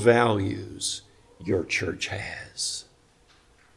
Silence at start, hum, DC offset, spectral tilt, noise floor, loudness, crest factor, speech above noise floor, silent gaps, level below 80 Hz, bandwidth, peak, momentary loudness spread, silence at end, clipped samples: 0 s; none; under 0.1%; -4 dB/octave; -59 dBFS; -27 LUFS; 22 dB; 33 dB; none; -58 dBFS; 12 kHz; -6 dBFS; 13 LU; 0.95 s; under 0.1%